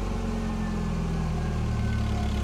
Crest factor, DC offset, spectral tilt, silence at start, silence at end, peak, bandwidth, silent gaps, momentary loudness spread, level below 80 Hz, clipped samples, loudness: 10 dB; under 0.1%; -7 dB/octave; 0 s; 0 s; -18 dBFS; 12.5 kHz; none; 2 LU; -32 dBFS; under 0.1%; -29 LUFS